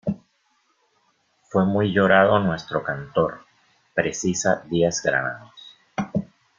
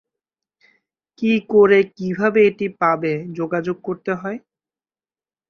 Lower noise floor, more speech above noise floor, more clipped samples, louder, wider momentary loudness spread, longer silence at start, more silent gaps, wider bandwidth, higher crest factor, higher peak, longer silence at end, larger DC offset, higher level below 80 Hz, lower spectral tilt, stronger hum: second, -67 dBFS vs under -90 dBFS; second, 46 dB vs over 72 dB; neither; second, -22 LUFS vs -19 LUFS; about the same, 14 LU vs 12 LU; second, 0.05 s vs 1.2 s; neither; first, 7.6 kHz vs 6.6 kHz; about the same, 22 dB vs 18 dB; about the same, -2 dBFS vs -2 dBFS; second, 0.35 s vs 1.1 s; neither; first, -56 dBFS vs -62 dBFS; second, -5 dB/octave vs -7.5 dB/octave; neither